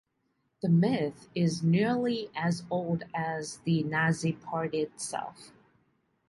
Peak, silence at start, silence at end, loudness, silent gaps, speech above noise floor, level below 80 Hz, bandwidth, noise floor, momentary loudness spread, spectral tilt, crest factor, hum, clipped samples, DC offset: -14 dBFS; 0.65 s; 0.8 s; -30 LUFS; none; 47 dB; -68 dBFS; 11.5 kHz; -76 dBFS; 9 LU; -6 dB/octave; 16 dB; none; under 0.1%; under 0.1%